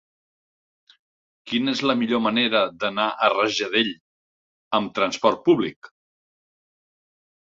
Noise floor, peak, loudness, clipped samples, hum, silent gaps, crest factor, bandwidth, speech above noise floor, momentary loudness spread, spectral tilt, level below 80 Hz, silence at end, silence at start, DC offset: under -90 dBFS; -4 dBFS; -22 LUFS; under 0.1%; none; 4.00-4.71 s, 5.76-5.82 s; 22 dB; 7.8 kHz; over 68 dB; 6 LU; -4 dB/octave; -66 dBFS; 1.55 s; 1.45 s; under 0.1%